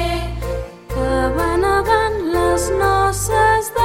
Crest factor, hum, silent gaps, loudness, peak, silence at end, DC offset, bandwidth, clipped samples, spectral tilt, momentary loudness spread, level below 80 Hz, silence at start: 14 dB; none; none; -17 LUFS; -4 dBFS; 0 s; under 0.1%; 16.5 kHz; under 0.1%; -4.5 dB/octave; 10 LU; -28 dBFS; 0 s